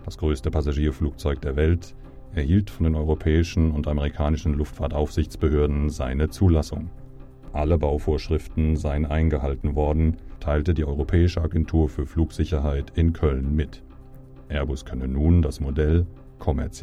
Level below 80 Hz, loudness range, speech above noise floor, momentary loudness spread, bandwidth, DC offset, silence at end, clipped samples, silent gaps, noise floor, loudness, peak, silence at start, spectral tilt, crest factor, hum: -28 dBFS; 2 LU; 21 dB; 7 LU; 11 kHz; under 0.1%; 0 s; under 0.1%; none; -43 dBFS; -24 LUFS; -6 dBFS; 0 s; -8 dB/octave; 16 dB; none